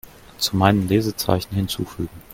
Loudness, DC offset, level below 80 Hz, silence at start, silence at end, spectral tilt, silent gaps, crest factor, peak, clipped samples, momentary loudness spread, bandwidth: -21 LUFS; under 0.1%; -46 dBFS; 0.4 s; 0.15 s; -5.5 dB/octave; none; 22 dB; 0 dBFS; under 0.1%; 10 LU; 17 kHz